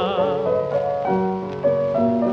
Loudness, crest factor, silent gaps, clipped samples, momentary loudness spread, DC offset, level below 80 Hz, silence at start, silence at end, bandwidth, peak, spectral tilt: -21 LUFS; 14 dB; none; under 0.1%; 3 LU; under 0.1%; -54 dBFS; 0 s; 0 s; 6.4 kHz; -6 dBFS; -8.5 dB/octave